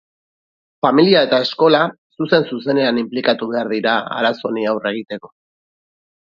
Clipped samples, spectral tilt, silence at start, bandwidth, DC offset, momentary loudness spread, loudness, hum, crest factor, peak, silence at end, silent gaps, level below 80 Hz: under 0.1%; -7 dB/octave; 0.85 s; 7.2 kHz; under 0.1%; 10 LU; -17 LUFS; none; 18 dB; 0 dBFS; 0.95 s; 1.98-2.10 s; -66 dBFS